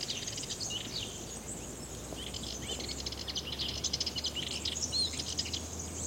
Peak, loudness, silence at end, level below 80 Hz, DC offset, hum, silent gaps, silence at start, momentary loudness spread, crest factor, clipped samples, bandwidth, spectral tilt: -18 dBFS; -35 LUFS; 0 s; -52 dBFS; under 0.1%; none; none; 0 s; 9 LU; 20 dB; under 0.1%; 17 kHz; -2 dB/octave